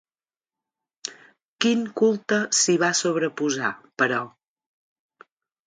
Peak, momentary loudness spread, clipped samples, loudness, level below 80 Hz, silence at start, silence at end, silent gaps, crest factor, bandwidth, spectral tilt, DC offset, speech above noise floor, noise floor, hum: -4 dBFS; 17 LU; under 0.1%; -22 LUFS; -74 dBFS; 1.05 s; 1.35 s; 1.45-1.56 s; 22 dB; 10 kHz; -3 dB/octave; under 0.1%; over 68 dB; under -90 dBFS; none